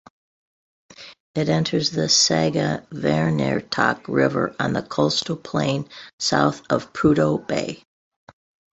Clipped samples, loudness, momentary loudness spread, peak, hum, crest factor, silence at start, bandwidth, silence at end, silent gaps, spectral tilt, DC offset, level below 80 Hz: under 0.1%; -21 LUFS; 9 LU; -2 dBFS; none; 20 dB; 1 s; 8.4 kHz; 1 s; 1.20-1.34 s, 6.13-6.19 s; -4 dB/octave; under 0.1%; -54 dBFS